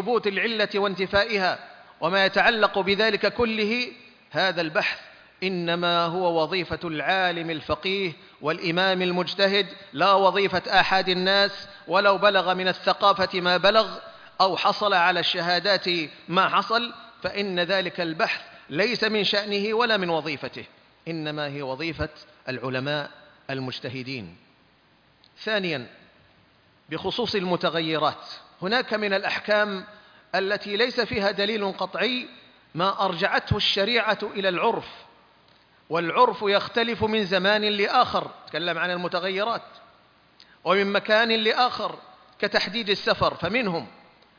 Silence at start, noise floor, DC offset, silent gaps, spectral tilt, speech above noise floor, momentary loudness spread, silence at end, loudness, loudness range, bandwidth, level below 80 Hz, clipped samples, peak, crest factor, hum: 0 s; -60 dBFS; under 0.1%; none; -5 dB/octave; 36 dB; 12 LU; 0.5 s; -23 LUFS; 9 LU; 5.4 kHz; -56 dBFS; under 0.1%; -6 dBFS; 20 dB; none